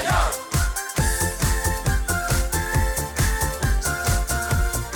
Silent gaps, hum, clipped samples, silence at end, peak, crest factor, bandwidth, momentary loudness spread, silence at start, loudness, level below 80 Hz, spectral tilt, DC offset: none; none; under 0.1%; 0 s; -8 dBFS; 14 dB; over 20 kHz; 2 LU; 0 s; -23 LUFS; -26 dBFS; -3.5 dB/octave; under 0.1%